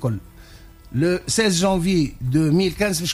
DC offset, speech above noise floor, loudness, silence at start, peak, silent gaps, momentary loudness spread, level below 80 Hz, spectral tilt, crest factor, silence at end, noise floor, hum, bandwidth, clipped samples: under 0.1%; 24 dB; -20 LUFS; 0 s; -8 dBFS; none; 8 LU; -40 dBFS; -5 dB/octave; 14 dB; 0 s; -44 dBFS; none; 15.5 kHz; under 0.1%